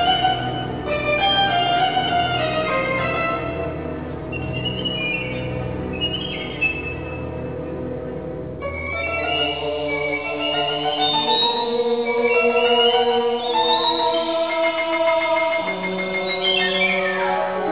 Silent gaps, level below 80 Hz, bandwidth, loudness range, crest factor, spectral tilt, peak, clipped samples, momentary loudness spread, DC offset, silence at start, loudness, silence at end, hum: none; -42 dBFS; 4 kHz; 7 LU; 16 dB; -8.5 dB/octave; -6 dBFS; under 0.1%; 12 LU; 0.3%; 0 s; -20 LUFS; 0 s; none